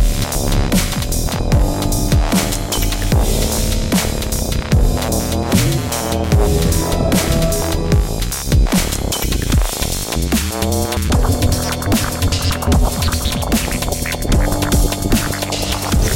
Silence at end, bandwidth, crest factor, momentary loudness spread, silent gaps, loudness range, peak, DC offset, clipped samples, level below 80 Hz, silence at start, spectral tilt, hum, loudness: 0 s; 17 kHz; 14 dB; 4 LU; none; 1 LU; 0 dBFS; under 0.1%; under 0.1%; -20 dBFS; 0 s; -4.5 dB/octave; none; -17 LUFS